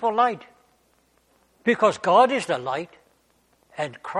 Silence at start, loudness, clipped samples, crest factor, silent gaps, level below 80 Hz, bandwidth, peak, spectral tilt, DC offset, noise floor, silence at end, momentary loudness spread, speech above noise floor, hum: 0 s; -22 LUFS; under 0.1%; 20 dB; none; -70 dBFS; 11.5 kHz; -6 dBFS; -4.5 dB/octave; under 0.1%; -64 dBFS; 0 s; 18 LU; 42 dB; none